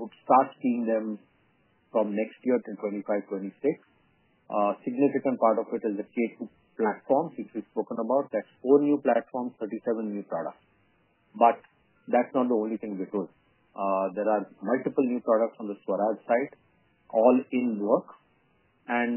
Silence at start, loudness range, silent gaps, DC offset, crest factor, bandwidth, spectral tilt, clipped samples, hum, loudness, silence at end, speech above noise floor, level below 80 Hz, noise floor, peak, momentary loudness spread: 0 s; 3 LU; none; under 0.1%; 22 dB; 3.2 kHz; -10.5 dB/octave; under 0.1%; none; -28 LUFS; 0 s; 40 dB; -82 dBFS; -67 dBFS; -6 dBFS; 12 LU